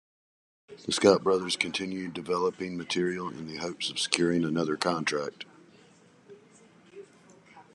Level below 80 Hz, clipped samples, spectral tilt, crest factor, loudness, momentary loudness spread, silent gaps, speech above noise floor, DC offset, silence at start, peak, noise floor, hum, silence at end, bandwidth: -70 dBFS; under 0.1%; -4 dB/octave; 28 dB; -28 LUFS; 13 LU; none; 30 dB; under 0.1%; 0.7 s; -4 dBFS; -58 dBFS; none; 0.15 s; 12 kHz